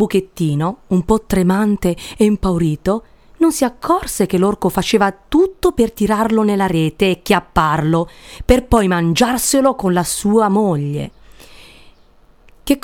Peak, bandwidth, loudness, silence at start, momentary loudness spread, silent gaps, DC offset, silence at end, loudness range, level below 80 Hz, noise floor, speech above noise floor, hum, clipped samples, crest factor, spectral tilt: 0 dBFS; 17.5 kHz; -16 LUFS; 0 s; 6 LU; none; under 0.1%; 0.05 s; 2 LU; -32 dBFS; -48 dBFS; 33 dB; none; under 0.1%; 16 dB; -5.5 dB/octave